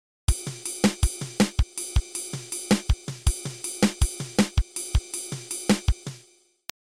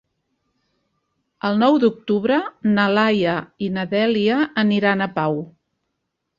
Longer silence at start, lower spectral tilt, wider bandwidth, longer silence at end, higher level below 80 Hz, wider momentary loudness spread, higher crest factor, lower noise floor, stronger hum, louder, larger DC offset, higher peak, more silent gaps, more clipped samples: second, 0.3 s vs 1.45 s; second, -4.5 dB/octave vs -7.5 dB/octave; first, 16 kHz vs 7.2 kHz; second, 0.6 s vs 0.9 s; first, -30 dBFS vs -62 dBFS; about the same, 9 LU vs 9 LU; about the same, 18 dB vs 18 dB; second, -58 dBFS vs -77 dBFS; neither; second, -27 LUFS vs -19 LUFS; neither; second, -8 dBFS vs -4 dBFS; neither; neither